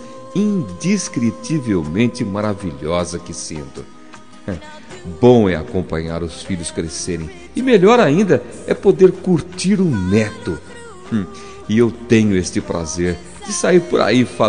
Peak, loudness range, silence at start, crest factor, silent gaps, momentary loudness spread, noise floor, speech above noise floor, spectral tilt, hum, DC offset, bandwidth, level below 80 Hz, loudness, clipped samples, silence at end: 0 dBFS; 7 LU; 0 s; 16 dB; none; 17 LU; -41 dBFS; 25 dB; -5.5 dB/octave; none; 1%; 10 kHz; -44 dBFS; -17 LUFS; under 0.1%; 0 s